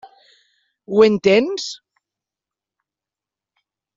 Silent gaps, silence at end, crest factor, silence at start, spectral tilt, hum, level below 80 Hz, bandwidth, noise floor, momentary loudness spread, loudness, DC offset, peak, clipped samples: none; 2.2 s; 20 dB; 0.9 s; -4 dB/octave; none; -62 dBFS; 7.8 kHz; -89 dBFS; 16 LU; -16 LUFS; under 0.1%; -2 dBFS; under 0.1%